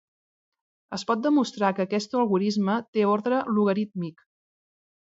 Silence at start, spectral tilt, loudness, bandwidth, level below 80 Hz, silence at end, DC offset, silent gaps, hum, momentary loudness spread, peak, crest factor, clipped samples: 0.9 s; -6.5 dB/octave; -25 LUFS; 7.8 kHz; -74 dBFS; 0.95 s; under 0.1%; 2.88-2.93 s; none; 10 LU; -8 dBFS; 18 dB; under 0.1%